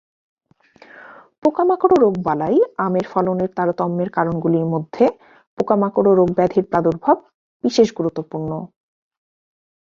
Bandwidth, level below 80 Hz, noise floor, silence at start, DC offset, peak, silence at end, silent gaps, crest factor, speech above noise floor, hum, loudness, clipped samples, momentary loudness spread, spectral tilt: 7.4 kHz; -56 dBFS; -51 dBFS; 0.95 s; under 0.1%; -2 dBFS; 1.15 s; 1.38-1.42 s, 5.47-5.57 s, 7.34-7.60 s; 18 dB; 34 dB; none; -18 LUFS; under 0.1%; 10 LU; -7.5 dB/octave